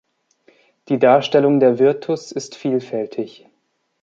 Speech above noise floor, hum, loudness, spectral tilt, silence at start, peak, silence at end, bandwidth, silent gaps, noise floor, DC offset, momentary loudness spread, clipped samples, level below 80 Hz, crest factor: 51 dB; none; -17 LUFS; -6 dB/octave; 0.9 s; -2 dBFS; 0.75 s; 7.8 kHz; none; -68 dBFS; under 0.1%; 14 LU; under 0.1%; -70 dBFS; 18 dB